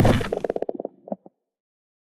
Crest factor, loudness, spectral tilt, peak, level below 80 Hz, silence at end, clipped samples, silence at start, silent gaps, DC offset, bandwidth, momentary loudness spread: 16 dB; -28 LUFS; -7 dB/octave; -10 dBFS; -36 dBFS; 0.95 s; under 0.1%; 0 s; none; under 0.1%; 13.5 kHz; 15 LU